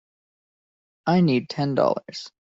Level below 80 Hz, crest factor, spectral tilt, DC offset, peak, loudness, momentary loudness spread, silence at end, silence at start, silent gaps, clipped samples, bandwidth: -66 dBFS; 18 dB; -7.5 dB/octave; under 0.1%; -6 dBFS; -23 LUFS; 11 LU; 0.1 s; 1.05 s; none; under 0.1%; 7.6 kHz